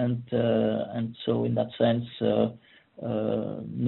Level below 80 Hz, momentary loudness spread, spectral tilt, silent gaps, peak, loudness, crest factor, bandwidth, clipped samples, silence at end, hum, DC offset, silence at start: -62 dBFS; 7 LU; -7 dB/octave; none; -10 dBFS; -28 LUFS; 18 dB; 4.2 kHz; under 0.1%; 0 s; none; under 0.1%; 0 s